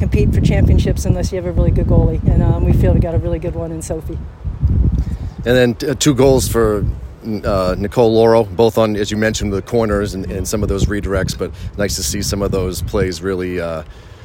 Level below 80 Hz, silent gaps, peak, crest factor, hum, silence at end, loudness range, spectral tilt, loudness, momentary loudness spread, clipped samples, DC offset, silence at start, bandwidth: -22 dBFS; none; 0 dBFS; 14 dB; none; 0 s; 4 LU; -6 dB/octave; -16 LUFS; 11 LU; under 0.1%; under 0.1%; 0 s; 16.5 kHz